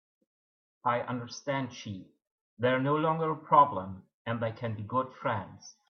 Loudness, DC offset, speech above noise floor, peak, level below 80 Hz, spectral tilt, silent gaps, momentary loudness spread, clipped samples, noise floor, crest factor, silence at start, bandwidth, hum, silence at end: -30 LUFS; under 0.1%; over 60 dB; -10 dBFS; -74 dBFS; -6.5 dB/octave; 2.27-2.57 s, 4.14-4.25 s; 18 LU; under 0.1%; under -90 dBFS; 22 dB; 0.85 s; 6.8 kHz; none; 0.2 s